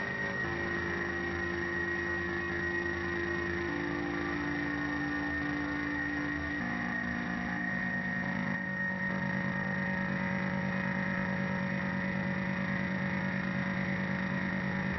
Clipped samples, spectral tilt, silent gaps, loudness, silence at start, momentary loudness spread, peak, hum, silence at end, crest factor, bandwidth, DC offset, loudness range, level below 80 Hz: under 0.1%; -5 dB/octave; none; -33 LUFS; 0 s; 1 LU; -20 dBFS; none; 0 s; 14 dB; 6 kHz; under 0.1%; 1 LU; -54 dBFS